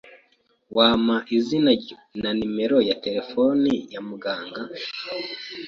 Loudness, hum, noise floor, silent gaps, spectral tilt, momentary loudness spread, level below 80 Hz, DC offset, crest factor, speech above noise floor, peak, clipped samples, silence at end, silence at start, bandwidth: -23 LUFS; none; -64 dBFS; none; -6 dB/octave; 13 LU; -58 dBFS; under 0.1%; 18 dB; 41 dB; -4 dBFS; under 0.1%; 0 s; 0.05 s; 7.2 kHz